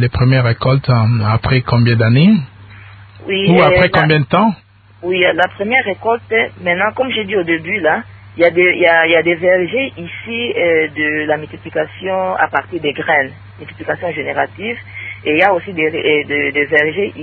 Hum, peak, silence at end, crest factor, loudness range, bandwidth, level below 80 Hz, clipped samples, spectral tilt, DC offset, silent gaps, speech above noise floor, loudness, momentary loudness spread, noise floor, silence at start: none; 0 dBFS; 0 s; 14 dB; 5 LU; 4.7 kHz; -40 dBFS; under 0.1%; -9 dB/octave; under 0.1%; none; 23 dB; -14 LUFS; 12 LU; -37 dBFS; 0 s